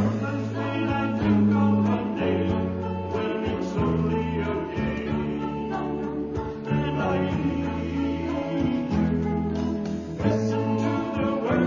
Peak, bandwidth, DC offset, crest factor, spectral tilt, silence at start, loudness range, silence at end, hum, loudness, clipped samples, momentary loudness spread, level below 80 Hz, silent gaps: -10 dBFS; 7.4 kHz; under 0.1%; 16 dB; -8 dB/octave; 0 s; 3 LU; 0 s; none; -26 LUFS; under 0.1%; 7 LU; -40 dBFS; none